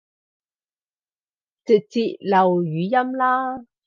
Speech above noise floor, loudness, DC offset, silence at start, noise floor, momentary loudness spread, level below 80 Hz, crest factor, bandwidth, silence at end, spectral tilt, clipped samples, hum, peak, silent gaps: over 70 dB; -20 LUFS; under 0.1%; 1.65 s; under -90 dBFS; 7 LU; -72 dBFS; 18 dB; 7.2 kHz; 0.25 s; -7.5 dB/octave; under 0.1%; none; -4 dBFS; none